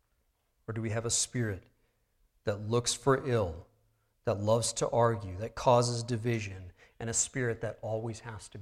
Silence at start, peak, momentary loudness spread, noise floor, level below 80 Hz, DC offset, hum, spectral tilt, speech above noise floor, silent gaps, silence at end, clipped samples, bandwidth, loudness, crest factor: 0.7 s; -12 dBFS; 15 LU; -75 dBFS; -60 dBFS; under 0.1%; none; -4.5 dB/octave; 44 dB; none; 0 s; under 0.1%; 14.5 kHz; -31 LUFS; 20 dB